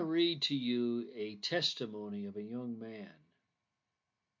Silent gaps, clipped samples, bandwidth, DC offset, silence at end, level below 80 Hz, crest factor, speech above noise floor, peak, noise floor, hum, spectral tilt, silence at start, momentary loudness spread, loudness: none; under 0.1%; 7.6 kHz; under 0.1%; 1.25 s; -86 dBFS; 18 dB; 51 dB; -20 dBFS; -88 dBFS; none; -4.5 dB/octave; 0 s; 13 LU; -36 LUFS